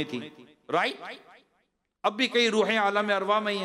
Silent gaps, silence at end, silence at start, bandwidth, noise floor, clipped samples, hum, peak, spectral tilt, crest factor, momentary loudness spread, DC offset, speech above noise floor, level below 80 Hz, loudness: none; 0 s; 0 s; 13 kHz; -74 dBFS; under 0.1%; none; -12 dBFS; -3.5 dB/octave; 16 dB; 18 LU; under 0.1%; 48 dB; -84 dBFS; -26 LUFS